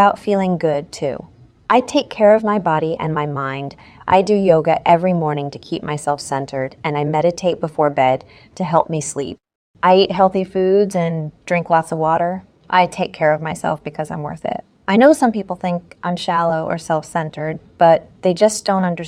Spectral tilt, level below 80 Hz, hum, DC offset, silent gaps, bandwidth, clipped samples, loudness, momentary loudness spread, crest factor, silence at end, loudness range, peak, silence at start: -5.5 dB/octave; -54 dBFS; none; under 0.1%; 9.55-9.74 s; 14.5 kHz; under 0.1%; -17 LUFS; 12 LU; 16 dB; 0 s; 3 LU; 0 dBFS; 0 s